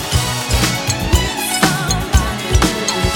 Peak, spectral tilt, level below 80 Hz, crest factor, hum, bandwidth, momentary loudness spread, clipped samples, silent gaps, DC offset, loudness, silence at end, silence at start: 0 dBFS; -3.5 dB/octave; -22 dBFS; 16 dB; none; 19.5 kHz; 3 LU; under 0.1%; none; under 0.1%; -16 LUFS; 0 s; 0 s